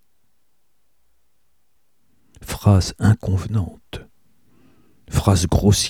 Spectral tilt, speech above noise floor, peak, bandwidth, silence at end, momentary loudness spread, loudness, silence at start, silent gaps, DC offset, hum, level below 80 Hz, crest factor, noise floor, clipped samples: -5.5 dB/octave; 54 dB; -2 dBFS; 16 kHz; 0 s; 21 LU; -19 LUFS; 2.4 s; none; 0.2%; none; -36 dBFS; 20 dB; -71 dBFS; under 0.1%